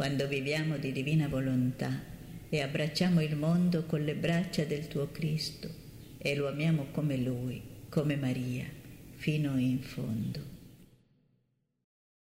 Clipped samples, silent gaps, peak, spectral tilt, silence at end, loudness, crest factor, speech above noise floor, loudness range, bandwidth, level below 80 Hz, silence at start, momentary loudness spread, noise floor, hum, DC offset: under 0.1%; none; -16 dBFS; -6.5 dB/octave; 1.55 s; -32 LUFS; 16 dB; 45 dB; 5 LU; 16 kHz; -58 dBFS; 0 s; 15 LU; -76 dBFS; none; under 0.1%